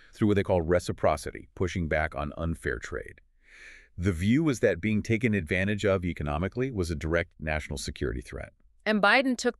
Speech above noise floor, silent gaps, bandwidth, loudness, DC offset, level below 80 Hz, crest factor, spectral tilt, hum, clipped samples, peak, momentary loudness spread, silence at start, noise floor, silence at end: 24 dB; none; 13 kHz; -28 LUFS; under 0.1%; -44 dBFS; 20 dB; -6 dB/octave; none; under 0.1%; -8 dBFS; 12 LU; 0.15 s; -52 dBFS; 0.1 s